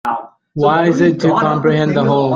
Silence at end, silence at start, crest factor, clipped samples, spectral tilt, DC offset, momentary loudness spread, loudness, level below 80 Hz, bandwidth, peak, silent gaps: 0 s; 0.05 s; 12 dB; under 0.1%; -7.5 dB/octave; under 0.1%; 10 LU; -14 LUFS; -52 dBFS; 7.4 kHz; 0 dBFS; none